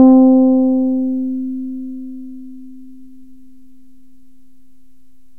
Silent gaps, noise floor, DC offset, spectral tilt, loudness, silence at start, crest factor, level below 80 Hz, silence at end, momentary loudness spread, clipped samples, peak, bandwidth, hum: none; -55 dBFS; 2%; -11 dB/octave; -14 LUFS; 0 s; 16 dB; -54 dBFS; 2.65 s; 26 LU; under 0.1%; 0 dBFS; 1.4 kHz; none